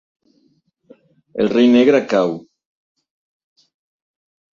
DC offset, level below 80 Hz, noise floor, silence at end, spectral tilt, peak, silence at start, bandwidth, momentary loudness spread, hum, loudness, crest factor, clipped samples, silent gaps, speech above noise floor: under 0.1%; -62 dBFS; -62 dBFS; 2.2 s; -6 dB/octave; -2 dBFS; 1.35 s; 7.2 kHz; 17 LU; none; -15 LUFS; 18 dB; under 0.1%; none; 48 dB